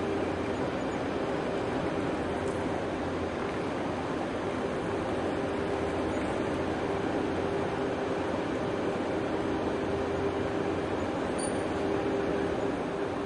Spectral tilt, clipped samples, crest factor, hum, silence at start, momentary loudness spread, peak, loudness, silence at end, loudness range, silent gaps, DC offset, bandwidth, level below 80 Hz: -6 dB/octave; under 0.1%; 12 dB; none; 0 s; 2 LU; -18 dBFS; -31 LUFS; 0 s; 1 LU; none; under 0.1%; 11.5 kHz; -52 dBFS